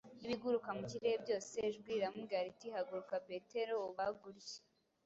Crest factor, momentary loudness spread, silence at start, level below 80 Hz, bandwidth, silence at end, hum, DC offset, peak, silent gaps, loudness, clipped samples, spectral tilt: 16 dB; 9 LU; 0.05 s; -80 dBFS; 8 kHz; 0.45 s; none; under 0.1%; -26 dBFS; none; -42 LUFS; under 0.1%; -3.5 dB/octave